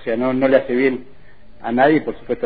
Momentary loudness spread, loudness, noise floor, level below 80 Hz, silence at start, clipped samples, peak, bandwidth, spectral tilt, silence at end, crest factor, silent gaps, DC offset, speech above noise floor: 12 LU; -17 LUFS; -47 dBFS; -48 dBFS; 0.05 s; under 0.1%; -2 dBFS; 4.9 kHz; -10 dB/octave; 0 s; 16 dB; none; 1%; 30 dB